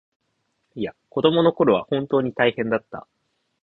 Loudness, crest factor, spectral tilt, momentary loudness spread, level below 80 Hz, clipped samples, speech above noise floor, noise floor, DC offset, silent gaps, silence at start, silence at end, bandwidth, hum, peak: -21 LUFS; 20 dB; -9 dB/octave; 17 LU; -60 dBFS; under 0.1%; 51 dB; -72 dBFS; under 0.1%; none; 0.75 s; 0.65 s; 4.4 kHz; none; -2 dBFS